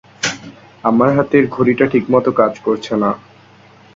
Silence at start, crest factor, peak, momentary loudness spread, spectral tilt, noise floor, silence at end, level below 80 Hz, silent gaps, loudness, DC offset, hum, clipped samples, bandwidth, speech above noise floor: 0.2 s; 16 dB; 0 dBFS; 8 LU; -5.5 dB/octave; -45 dBFS; 0.75 s; -52 dBFS; none; -15 LUFS; under 0.1%; none; under 0.1%; 7.8 kHz; 31 dB